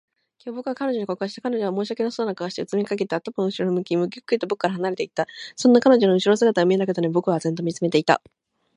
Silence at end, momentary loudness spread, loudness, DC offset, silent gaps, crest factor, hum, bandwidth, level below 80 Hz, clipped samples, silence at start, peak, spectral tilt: 0.6 s; 10 LU; -22 LUFS; under 0.1%; none; 20 dB; none; 10.5 kHz; -72 dBFS; under 0.1%; 0.45 s; -2 dBFS; -6 dB/octave